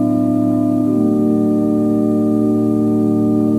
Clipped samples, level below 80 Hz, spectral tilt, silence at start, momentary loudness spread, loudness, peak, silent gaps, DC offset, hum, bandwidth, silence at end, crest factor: under 0.1%; -50 dBFS; -10.5 dB/octave; 0 s; 1 LU; -15 LUFS; -4 dBFS; none; under 0.1%; none; 12.5 kHz; 0 s; 10 dB